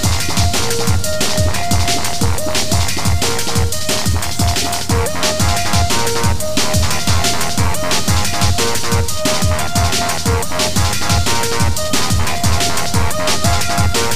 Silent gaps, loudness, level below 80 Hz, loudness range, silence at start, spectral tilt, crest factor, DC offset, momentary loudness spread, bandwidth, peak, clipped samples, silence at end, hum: none; -16 LUFS; -26 dBFS; 1 LU; 0 s; -3.5 dB/octave; 14 dB; 10%; 2 LU; 16 kHz; 0 dBFS; under 0.1%; 0 s; none